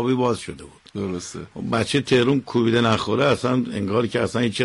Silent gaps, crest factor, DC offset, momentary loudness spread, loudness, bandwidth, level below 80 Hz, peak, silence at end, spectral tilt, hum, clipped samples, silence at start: none; 14 dB; under 0.1%; 13 LU; -21 LUFS; 11.5 kHz; -52 dBFS; -8 dBFS; 0 s; -5.5 dB/octave; none; under 0.1%; 0 s